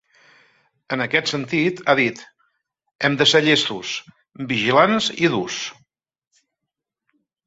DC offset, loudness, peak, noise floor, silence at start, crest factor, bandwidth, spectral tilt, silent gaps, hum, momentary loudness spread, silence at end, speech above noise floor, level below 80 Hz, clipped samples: under 0.1%; -19 LUFS; -2 dBFS; -83 dBFS; 0.9 s; 20 dB; 8 kHz; -4 dB/octave; 2.95-2.99 s; none; 14 LU; 1.75 s; 64 dB; -62 dBFS; under 0.1%